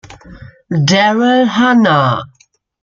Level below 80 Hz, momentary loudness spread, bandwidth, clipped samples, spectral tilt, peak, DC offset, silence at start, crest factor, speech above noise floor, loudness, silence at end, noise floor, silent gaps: -50 dBFS; 7 LU; 7.4 kHz; under 0.1%; -5.5 dB/octave; 0 dBFS; under 0.1%; 0.1 s; 12 dB; 42 dB; -12 LUFS; 0.55 s; -54 dBFS; none